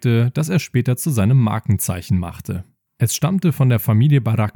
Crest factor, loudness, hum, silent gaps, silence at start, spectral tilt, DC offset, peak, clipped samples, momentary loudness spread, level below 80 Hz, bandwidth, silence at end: 12 dB; -18 LUFS; none; none; 0 s; -6.5 dB/octave; under 0.1%; -6 dBFS; under 0.1%; 7 LU; -48 dBFS; 19 kHz; 0.05 s